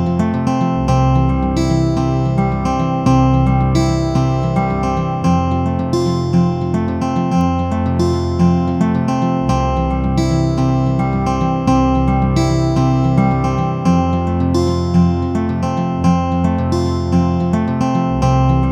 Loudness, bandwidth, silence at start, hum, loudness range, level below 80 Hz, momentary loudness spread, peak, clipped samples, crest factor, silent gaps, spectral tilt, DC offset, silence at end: -16 LUFS; 10 kHz; 0 s; none; 1 LU; -26 dBFS; 3 LU; 0 dBFS; under 0.1%; 14 dB; none; -8 dB/octave; under 0.1%; 0 s